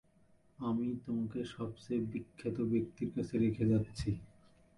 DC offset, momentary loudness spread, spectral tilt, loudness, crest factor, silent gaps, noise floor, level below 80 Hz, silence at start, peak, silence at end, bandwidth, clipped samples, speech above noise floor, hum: under 0.1%; 9 LU; -8 dB/octave; -37 LUFS; 14 dB; none; -67 dBFS; -58 dBFS; 0.6 s; -22 dBFS; 0.5 s; 11.5 kHz; under 0.1%; 32 dB; none